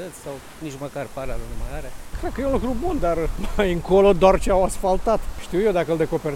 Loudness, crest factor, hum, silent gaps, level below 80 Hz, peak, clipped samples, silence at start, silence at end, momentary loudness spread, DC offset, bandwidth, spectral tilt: -22 LUFS; 20 dB; none; none; -30 dBFS; -2 dBFS; under 0.1%; 0 s; 0 s; 18 LU; under 0.1%; 16 kHz; -6 dB/octave